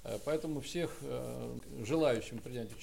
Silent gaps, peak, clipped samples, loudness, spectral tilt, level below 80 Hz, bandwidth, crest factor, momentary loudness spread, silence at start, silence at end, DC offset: none; -20 dBFS; under 0.1%; -37 LUFS; -5.5 dB/octave; -58 dBFS; 16 kHz; 18 dB; 12 LU; 0 s; 0 s; 0.3%